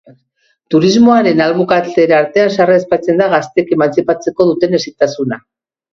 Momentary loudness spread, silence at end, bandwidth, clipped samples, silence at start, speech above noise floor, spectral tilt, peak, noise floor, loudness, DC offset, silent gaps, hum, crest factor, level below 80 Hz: 7 LU; 0.55 s; 7.4 kHz; under 0.1%; 0.7 s; 50 dB; -6 dB/octave; 0 dBFS; -61 dBFS; -12 LUFS; under 0.1%; none; none; 12 dB; -54 dBFS